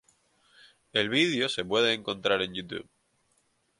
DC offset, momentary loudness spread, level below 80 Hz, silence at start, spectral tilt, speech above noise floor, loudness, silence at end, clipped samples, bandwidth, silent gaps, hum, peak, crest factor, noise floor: under 0.1%; 12 LU; -66 dBFS; 0.95 s; -4 dB/octave; 43 dB; -27 LUFS; 1 s; under 0.1%; 11.5 kHz; none; none; -10 dBFS; 20 dB; -71 dBFS